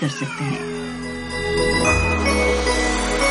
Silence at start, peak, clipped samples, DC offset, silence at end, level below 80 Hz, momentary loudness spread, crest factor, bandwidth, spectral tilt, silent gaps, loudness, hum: 0 s; -4 dBFS; under 0.1%; under 0.1%; 0 s; -30 dBFS; 11 LU; 16 dB; 11.5 kHz; -4 dB/octave; none; -20 LUFS; none